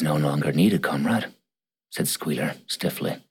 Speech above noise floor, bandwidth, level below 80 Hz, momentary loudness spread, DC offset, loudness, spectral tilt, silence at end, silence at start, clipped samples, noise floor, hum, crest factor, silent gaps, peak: 62 dB; 17.5 kHz; -64 dBFS; 8 LU; under 0.1%; -24 LUFS; -5 dB/octave; 0.1 s; 0 s; under 0.1%; -86 dBFS; none; 16 dB; none; -8 dBFS